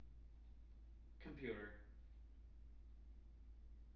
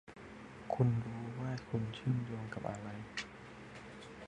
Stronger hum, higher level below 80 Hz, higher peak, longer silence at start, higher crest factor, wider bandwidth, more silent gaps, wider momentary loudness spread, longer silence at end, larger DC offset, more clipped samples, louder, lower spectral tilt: neither; about the same, -60 dBFS vs -64 dBFS; second, -36 dBFS vs -18 dBFS; about the same, 0 s vs 0.05 s; about the same, 22 dB vs 22 dB; second, 5.6 kHz vs 9.8 kHz; neither; second, 14 LU vs 18 LU; about the same, 0 s vs 0 s; neither; neither; second, -59 LUFS vs -39 LUFS; second, -5.5 dB/octave vs -7 dB/octave